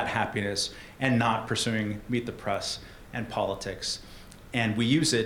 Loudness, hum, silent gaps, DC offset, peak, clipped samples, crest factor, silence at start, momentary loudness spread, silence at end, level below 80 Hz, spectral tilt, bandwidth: -29 LUFS; none; none; under 0.1%; -8 dBFS; under 0.1%; 20 dB; 0 s; 12 LU; 0 s; -52 dBFS; -4 dB/octave; 18 kHz